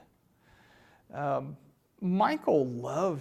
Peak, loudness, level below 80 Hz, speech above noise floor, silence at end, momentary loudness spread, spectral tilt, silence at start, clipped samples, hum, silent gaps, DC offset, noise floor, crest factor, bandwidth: -14 dBFS; -30 LUFS; -72 dBFS; 36 dB; 0 s; 18 LU; -7.5 dB/octave; 1.15 s; under 0.1%; none; none; under 0.1%; -65 dBFS; 18 dB; 13 kHz